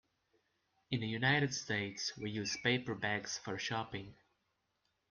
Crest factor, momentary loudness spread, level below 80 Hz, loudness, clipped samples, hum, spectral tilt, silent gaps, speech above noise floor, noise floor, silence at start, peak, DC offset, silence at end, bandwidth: 22 dB; 9 LU; -70 dBFS; -37 LUFS; under 0.1%; none; -4 dB/octave; none; 45 dB; -83 dBFS; 0.9 s; -18 dBFS; under 0.1%; 1 s; 10.5 kHz